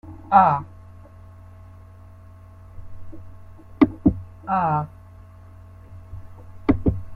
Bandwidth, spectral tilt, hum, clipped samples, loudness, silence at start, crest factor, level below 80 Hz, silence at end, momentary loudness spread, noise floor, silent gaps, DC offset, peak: 5.4 kHz; -10 dB/octave; none; under 0.1%; -21 LUFS; 0.05 s; 24 dB; -40 dBFS; 0 s; 28 LU; -44 dBFS; none; under 0.1%; -2 dBFS